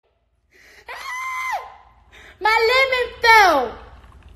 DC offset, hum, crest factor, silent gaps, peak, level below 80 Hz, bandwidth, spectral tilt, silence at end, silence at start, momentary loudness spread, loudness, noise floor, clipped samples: under 0.1%; none; 20 dB; none; 0 dBFS; -48 dBFS; 14.5 kHz; -1.5 dB/octave; 0.5 s; 0.9 s; 18 LU; -16 LUFS; -64 dBFS; under 0.1%